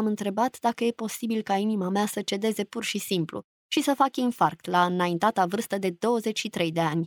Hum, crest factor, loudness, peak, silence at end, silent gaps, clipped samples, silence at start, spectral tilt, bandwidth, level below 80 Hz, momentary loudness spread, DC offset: none; 18 dB; -26 LUFS; -8 dBFS; 0 s; 3.44-3.69 s; under 0.1%; 0 s; -5 dB/octave; over 20 kHz; -72 dBFS; 5 LU; under 0.1%